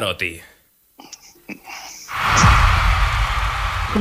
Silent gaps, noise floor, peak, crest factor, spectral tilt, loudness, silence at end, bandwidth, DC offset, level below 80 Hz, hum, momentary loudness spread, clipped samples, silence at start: none; -49 dBFS; -2 dBFS; 18 dB; -4 dB/octave; -18 LUFS; 0 s; 16 kHz; under 0.1%; -24 dBFS; none; 25 LU; under 0.1%; 0 s